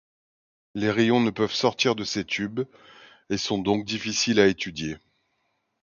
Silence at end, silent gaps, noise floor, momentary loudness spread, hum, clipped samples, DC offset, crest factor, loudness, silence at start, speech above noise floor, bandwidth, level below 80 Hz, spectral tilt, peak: 0.85 s; none; -74 dBFS; 12 LU; none; under 0.1%; under 0.1%; 22 dB; -24 LUFS; 0.75 s; 50 dB; 7.4 kHz; -58 dBFS; -4 dB/octave; -4 dBFS